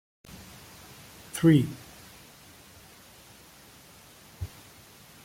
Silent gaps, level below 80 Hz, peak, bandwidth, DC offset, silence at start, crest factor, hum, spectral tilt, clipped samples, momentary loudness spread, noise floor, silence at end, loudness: none; -58 dBFS; -10 dBFS; 16.5 kHz; under 0.1%; 1.35 s; 22 dB; none; -6.5 dB/octave; under 0.1%; 28 LU; -53 dBFS; 0.8 s; -26 LUFS